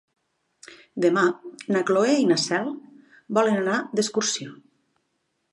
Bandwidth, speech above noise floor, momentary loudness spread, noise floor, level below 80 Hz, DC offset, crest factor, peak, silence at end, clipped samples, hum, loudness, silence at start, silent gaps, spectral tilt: 11.5 kHz; 52 dB; 14 LU; -74 dBFS; -76 dBFS; under 0.1%; 18 dB; -6 dBFS; 0.95 s; under 0.1%; none; -23 LUFS; 0.7 s; none; -4 dB/octave